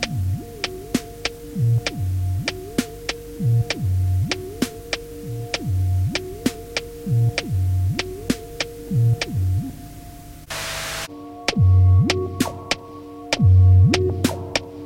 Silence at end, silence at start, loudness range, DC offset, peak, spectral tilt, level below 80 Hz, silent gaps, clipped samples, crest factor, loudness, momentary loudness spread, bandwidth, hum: 0 s; 0 s; 7 LU; under 0.1%; -2 dBFS; -5.5 dB/octave; -40 dBFS; none; under 0.1%; 18 dB; -22 LUFS; 14 LU; 16.5 kHz; none